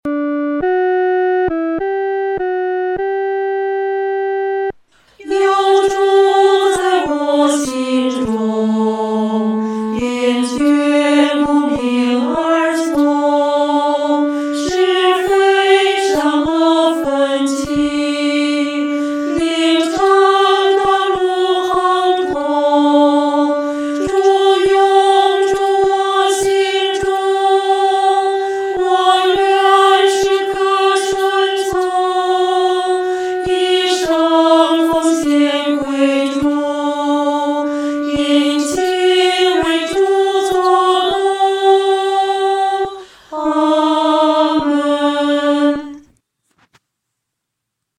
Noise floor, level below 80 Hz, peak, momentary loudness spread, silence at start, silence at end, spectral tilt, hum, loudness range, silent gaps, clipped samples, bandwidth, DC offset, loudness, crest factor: -77 dBFS; -48 dBFS; 0 dBFS; 7 LU; 0.05 s; 2 s; -3.5 dB/octave; none; 4 LU; none; under 0.1%; 13.5 kHz; under 0.1%; -14 LUFS; 14 dB